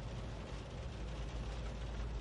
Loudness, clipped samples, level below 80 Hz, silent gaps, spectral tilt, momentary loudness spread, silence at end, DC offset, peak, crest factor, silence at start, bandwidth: -46 LUFS; under 0.1%; -46 dBFS; none; -6 dB/octave; 2 LU; 0 s; under 0.1%; -32 dBFS; 12 dB; 0 s; 10.5 kHz